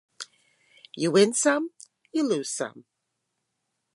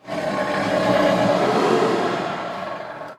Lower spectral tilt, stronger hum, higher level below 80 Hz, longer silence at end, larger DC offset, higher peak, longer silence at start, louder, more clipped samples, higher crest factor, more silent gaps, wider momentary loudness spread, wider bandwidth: second, -3.5 dB/octave vs -5.5 dB/octave; neither; second, -82 dBFS vs -56 dBFS; first, 1.15 s vs 0.05 s; neither; about the same, -6 dBFS vs -6 dBFS; first, 0.2 s vs 0.05 s; second, -25 LUFS vs -20 LUFS; neither; first, 22 dB vs 14 dB; neither; first, 21 LU vs 11 LU; second, 11.5 kHz vs 14.5 kHz